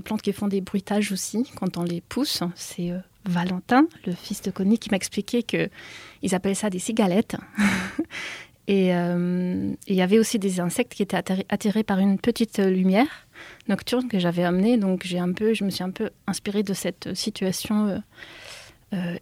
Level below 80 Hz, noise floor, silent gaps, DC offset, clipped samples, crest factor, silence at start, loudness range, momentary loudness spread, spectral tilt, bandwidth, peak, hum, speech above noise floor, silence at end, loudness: -58 dBFS; -44 dBFS; none; under 0.1%; under 0.1%; 18 dB; 0.05 s; 3 LU; 11 LU; -5.5 dB/octave; 16 kHz; -8 dBFS; none; 20 dB; 0 s; -25 LUFS